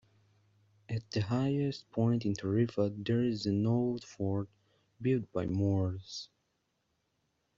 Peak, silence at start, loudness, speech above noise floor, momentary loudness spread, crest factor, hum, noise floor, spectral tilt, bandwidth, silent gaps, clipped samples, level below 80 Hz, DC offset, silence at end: -18 dBFS; 0.9 s; -33 LUFS; 48 dB; 10 LU; 16 dB; none; -79 dBFS; -7.5 dB/octave; 7.6 kHz; none; under 0.1%; -66 dBFS; under 0.1%; 1.3 s